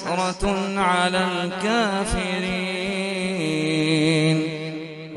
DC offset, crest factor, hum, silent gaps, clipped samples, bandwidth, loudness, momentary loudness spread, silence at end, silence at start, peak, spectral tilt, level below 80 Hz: under 0.1%; 16 dB; none; none; under 0.1%; 11.5 kHz; -22 LUFS; 6 LU; 0 s; 0 s; -6 dBFS; -5 dB/octave; -40 dBFS